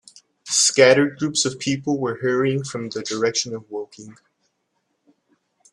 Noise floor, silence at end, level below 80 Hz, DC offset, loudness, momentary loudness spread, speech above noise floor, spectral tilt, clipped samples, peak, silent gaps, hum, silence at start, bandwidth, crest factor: -72 dBFS; 1.6 s; -66 dBFS; under 0.1%; -20 LUFS; 16 LU; 52 dB; -3 dB/octave; under 0.1%; 0 dBFS; none; none; 0.45 s; 13 kHz; 22 dB